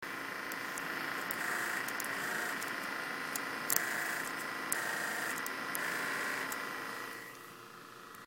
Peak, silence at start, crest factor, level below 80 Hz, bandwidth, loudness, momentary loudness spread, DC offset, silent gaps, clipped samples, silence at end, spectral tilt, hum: -6 dBFS; 0 s; 32 dB; -80 dBFS; 17 kHz; -36 LUFS; 10 LU; under 0.1%; none; under 0.1%; 0 s; -1 dB/octave; none